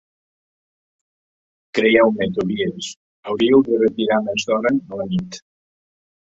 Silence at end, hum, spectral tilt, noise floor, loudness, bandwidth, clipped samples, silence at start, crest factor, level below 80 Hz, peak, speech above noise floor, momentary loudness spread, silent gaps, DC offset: 0.85 s; none; -5.5 dB/octave; under -90 dBFS; -18 LUFS; 8 kHz; under 0.1%; 1.75 s; 20 dB; -58 dBFS; -2 dBFS; over 72 dB; 16 LU; 2.96-3.23 s; under 0.1%